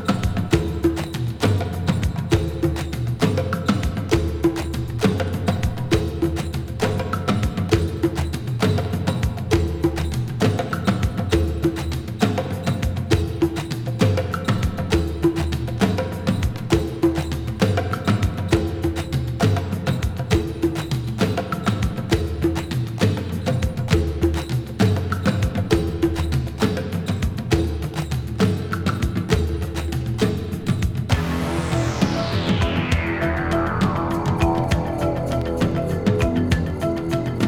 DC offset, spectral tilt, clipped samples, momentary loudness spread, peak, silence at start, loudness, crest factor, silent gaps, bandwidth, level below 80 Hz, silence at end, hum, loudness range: under 0.1%; -6.5 dB/octave; under 0.1%; 5 LU; -2 dBFS; 0 s; -22 LUFS; 20 dB; none; 17 kHz; -32 dBFS; 0 s; none; 1 LU